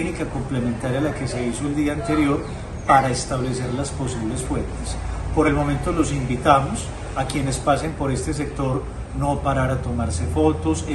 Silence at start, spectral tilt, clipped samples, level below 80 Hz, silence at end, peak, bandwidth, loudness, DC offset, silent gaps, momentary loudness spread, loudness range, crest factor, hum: 0 s; -6 dB/octave; under 0.1%; -32 dBFS; 0 s; 0 dBFS; 12 kHz; -22 LUFS; under 0.1%; none; 10 LU; 2 LU; 22 dB; none